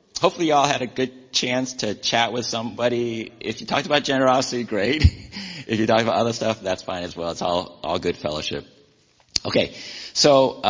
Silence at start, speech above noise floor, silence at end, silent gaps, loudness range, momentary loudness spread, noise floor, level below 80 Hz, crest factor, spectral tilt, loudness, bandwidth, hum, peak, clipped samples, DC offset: 0.15 s; 37 dB; 0 s; none; 5 LU; 10 LU; -59 dBFS; -36 dBFS; 22 dB; -4 dB/octave; -22 LUFS; 7.6 kHz; none; 0 dBFS; under 0.1%; under 0.1%